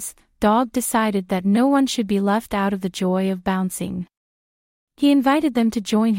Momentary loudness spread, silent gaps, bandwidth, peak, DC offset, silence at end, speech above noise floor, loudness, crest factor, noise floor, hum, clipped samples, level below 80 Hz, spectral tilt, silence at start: 8 LU; 4.17-4.87 s; 16.5 kHz; -6 dBFS; under 0.1%; 0 s; over 71 dB; -20 LUFS; 16 dB; under -90 dBFS; none; under 0.1%; -52 dBFS; -5.5 dB/octave; 0 s